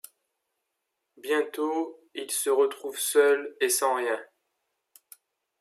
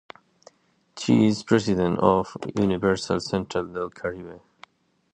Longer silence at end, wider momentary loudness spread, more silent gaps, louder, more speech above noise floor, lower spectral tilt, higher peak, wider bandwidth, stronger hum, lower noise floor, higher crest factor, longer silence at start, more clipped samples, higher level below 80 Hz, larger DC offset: first, 1.35 s vs 0.75 s; about the same, 12 LU vs 12 LU; neither; about the same, -26 LUFS vs -24 LUFS; first, 55 dB vs 33 dB; second, 0 dB/octave vs -6 dB/octave; second, -10 dBFS vs -4 dBFS; first, 15.5 kHz vs 9.8 kHz; neither; first, -82 dBFS vs -56 dBFS; about the same, 20 dB vs 20 dB; first, 1.25 s vs 0.95 s; neither; second, under -90 dBFS vs -52 dBFS; neither